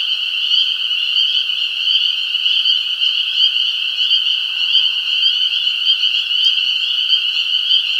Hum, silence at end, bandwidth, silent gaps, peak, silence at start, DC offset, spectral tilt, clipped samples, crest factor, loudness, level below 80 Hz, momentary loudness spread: none; 0 s; 16.5 kHz; none; 0 dBFS; 0 s; under 0.1%; 4 dB/octave; under 0.1%; 16 dB; -13 LUFS; -78 dBFS; 3 LU